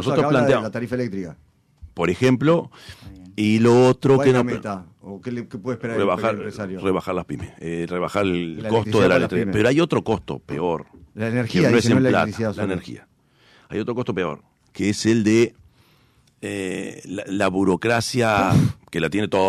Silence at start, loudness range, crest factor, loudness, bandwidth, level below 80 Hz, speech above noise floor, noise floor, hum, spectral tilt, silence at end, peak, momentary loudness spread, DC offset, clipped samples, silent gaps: 0 s; 5 LU; 14 dB; -21 LUFS; 14 kHz; -52 dBFS; 38 dB; -58 dBFS; none; -6 dB/octave; 0 s; -8 dBFS; 15 LU; under 0.1%; under 0.1%; none